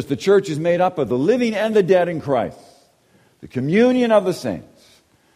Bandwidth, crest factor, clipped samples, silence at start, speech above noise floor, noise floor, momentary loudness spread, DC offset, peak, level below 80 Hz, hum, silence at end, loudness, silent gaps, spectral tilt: 14.5 kHz; 16 dB; under 0.1%; 0 s; 39 dB; -57 dBFS; 11 LU; under 0.1%; -2 dBFS; -58 dBFS; none; 0.7 s; -18 LUFS; none; -6.5 dB/octave